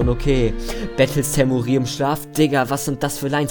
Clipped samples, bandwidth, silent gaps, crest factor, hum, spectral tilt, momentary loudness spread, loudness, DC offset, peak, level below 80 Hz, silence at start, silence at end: under 0.1%; 19 kHz; none; 16 dB; none; -5.5 dB/octave; 5 LU; -20 LUFS; under 0.1%; -2 dBFS; -30 dBFS; 0 s; 0 s